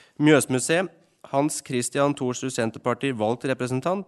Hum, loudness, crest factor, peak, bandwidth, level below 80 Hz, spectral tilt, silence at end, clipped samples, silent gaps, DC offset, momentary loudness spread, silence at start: none; -24 LUFS; 20 dB; -4 dBFS; 12 kHz; -68 dBFS; -4.5 dB/octave; 0.05 s; under 0.1%; none; under 0.1%; 8 LU; 0.2 s